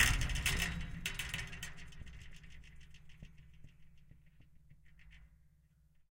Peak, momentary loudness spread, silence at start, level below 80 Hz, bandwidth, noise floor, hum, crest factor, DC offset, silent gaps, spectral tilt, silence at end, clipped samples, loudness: -14 dBFS; 27 LU; 0 s; -46 dBFS; 17 kHz; -68 dBFS; none; 28 dB; under 0.1%; none; -2.5 dB/octave; 0.75 s; under 0.1%; -38 LUFS